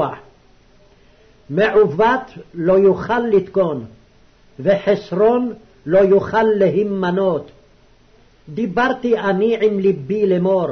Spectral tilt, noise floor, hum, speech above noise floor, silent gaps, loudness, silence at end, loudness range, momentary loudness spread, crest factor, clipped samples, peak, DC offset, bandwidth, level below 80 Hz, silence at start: -8 dB/octave; -51 dBFS; none; 35 dB; none; -17 LUFS; 0 s; 3 LU; 11 LU; 12 dB; under 0.1%; -6 dBFS; under 0.1%; 6.4 kHz; -50 dBFS; 0 s